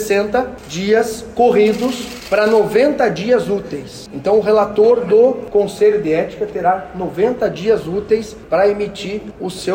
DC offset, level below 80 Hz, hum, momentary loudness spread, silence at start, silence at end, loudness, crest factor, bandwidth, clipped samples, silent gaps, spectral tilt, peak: under 0.1%; -46 dBFS; none; 12 LU; 0 s; 0 s; -16 LUFS; 12 dB; 16.5 kHz; under 0.1%; none; -5.5 dB/octave; -4 dBFS